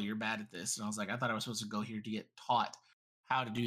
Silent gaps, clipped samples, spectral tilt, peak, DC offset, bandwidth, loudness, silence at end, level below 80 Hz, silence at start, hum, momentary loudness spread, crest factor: 2.93-3.24 s; under 0.1%; -3.5 dB/octave; -20 dBFS; under 0.1%; 15.5 kHz; -37 LUFS; 0 s; -80 dBFS; 0 s; none; 8 LU; 18 dB